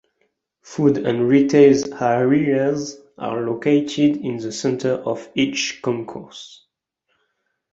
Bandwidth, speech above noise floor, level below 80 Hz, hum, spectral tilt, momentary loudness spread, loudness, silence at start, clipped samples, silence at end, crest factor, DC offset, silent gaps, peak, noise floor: 8 kHz; 54 dB; -60 dBFS; none; -5.5 dB/octave; 17 LU; -19 LUFS; 0.7 s; under 0.1%; 1.25 s; 18 dB; under 0.1%; none; -2 dBFS; -73 dBFS